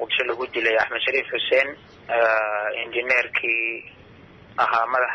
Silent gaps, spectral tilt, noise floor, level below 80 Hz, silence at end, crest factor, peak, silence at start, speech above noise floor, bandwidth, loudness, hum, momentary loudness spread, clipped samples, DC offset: none; -3.5 dB/octave; -47 dBFS; -62 dBFS; 0 s; 16 dB; -8 dBFS; 0 s; 25 dB; 8.4 kHz; -22 LUFS; none; 7 LU; under 0.1%; under 0.1%